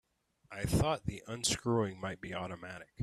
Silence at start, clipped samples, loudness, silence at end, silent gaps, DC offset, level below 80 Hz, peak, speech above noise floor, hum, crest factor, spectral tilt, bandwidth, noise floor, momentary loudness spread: 0.5 s; under 0.1%; -35 LUFS; 0 s; none; under 0.1%; -52 dBFS; -18 dBFS; 25 dB; none; 18 dB; -4.5 dB/octave; 14 kHz; -60 dBFS; 13 LU